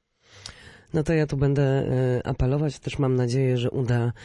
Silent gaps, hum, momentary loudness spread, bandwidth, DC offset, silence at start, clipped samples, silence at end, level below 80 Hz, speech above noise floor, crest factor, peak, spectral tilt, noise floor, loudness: none; none; 12 LU; 11 kHz; under 0.1%; 0.35 s; under 0.1%; 0 s; -42 dBFS; 23 dB; 14 dB; -12 dBFS; -7.5 dB/octave; -46 dBFS; -24 LUFS